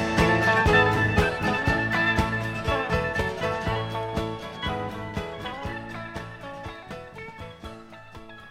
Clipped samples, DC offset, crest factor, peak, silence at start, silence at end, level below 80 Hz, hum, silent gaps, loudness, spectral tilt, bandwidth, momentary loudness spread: under 0.1%; under 0.1%; 20 dB; -6 dBFS; 0 s; 0 s; -40 dBFS; none; none; -25 LUFS; -5.5 dB/octave; 16 kHz; 20 LU